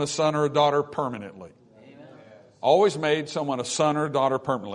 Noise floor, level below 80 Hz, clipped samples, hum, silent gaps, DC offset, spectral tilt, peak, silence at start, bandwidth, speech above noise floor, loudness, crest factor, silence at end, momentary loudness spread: -50 dBFS; -68 dBFS; under 0.1%; none; none; under 0.1%; -4.5 dB/octave; -8 dBFS; 0 s; 11 kHz; 26 dB; -24 LUFS; 18 dB; 0 s; 10 LU